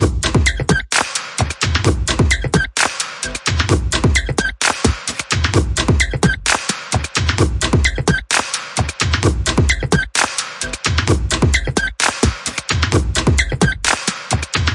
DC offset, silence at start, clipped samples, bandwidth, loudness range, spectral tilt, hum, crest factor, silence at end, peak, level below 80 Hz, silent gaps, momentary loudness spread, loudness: under 0.1%; 0 s; under 0.1%; 11.5 kHz; 1 LU; -3.5 dB/octave; none; 16 dB; 0 s; 0 dBFS; -24 dBFS; none; 4 LU; -17 LUFS